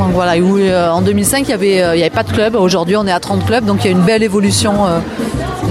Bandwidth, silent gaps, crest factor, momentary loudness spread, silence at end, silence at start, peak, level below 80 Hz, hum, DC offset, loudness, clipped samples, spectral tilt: 16 kHz; none; 12 dB; 4 LU; 0 s; 0 s; 0 dBFS; -34 dBFS; none; under 0.1%; -12 LUFS; under 0.1%; -5 dB/octave